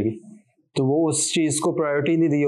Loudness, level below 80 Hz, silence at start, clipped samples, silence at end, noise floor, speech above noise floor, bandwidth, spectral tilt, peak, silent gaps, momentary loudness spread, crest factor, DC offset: -22 LUFS; -70 dBFS; 0 s; under 0.1%; 0 s; -49 dBFS; 29 dB; 12.5 kHz; -4.5 dB/octave; -12 dBFS; none; 8 LU; 10 dB; under 0.1%